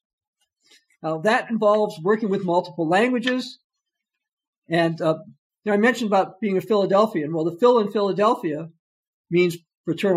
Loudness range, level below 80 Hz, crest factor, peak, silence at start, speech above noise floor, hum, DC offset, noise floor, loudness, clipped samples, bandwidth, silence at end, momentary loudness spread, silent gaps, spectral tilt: 4 LU; -76 dBFS; 16 dB; -6 dBFS; 1.05 s; 62 dB; none; under 0.1%; -83 dBFS; -21 LUFS; under 0.1%; 15 kHz; 0 s; 11 LU; 3.64-3.70 s, 4.33-4.37 s, 4.48-4.62 s, 5.38-5.50 s, 8.79-9.24 s, 9.77-9.84 s; -6 dB/octave